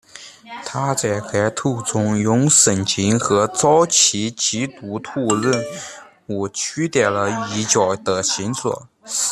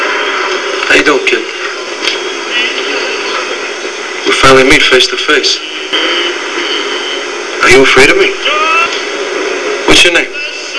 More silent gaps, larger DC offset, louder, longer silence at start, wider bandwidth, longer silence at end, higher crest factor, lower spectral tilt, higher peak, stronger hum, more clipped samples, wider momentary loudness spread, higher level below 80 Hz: neither; neither; second, -18 LUFS vs -9 LUFS; first, 0.15 s vs 0 s; first, 14 kHz vs 11 kHz; about the same, 0 s vs 0 s; first, 18 dB vs 10 dB; first, -3.5 dB/octave vs -2 dB/octave; about the same, -2 dBFS vs 0 dBFS; neither; second, under 0.1% vs 2%; first, 16 LU vs 12 LU; second, -58 dBFS vs -34 dBFS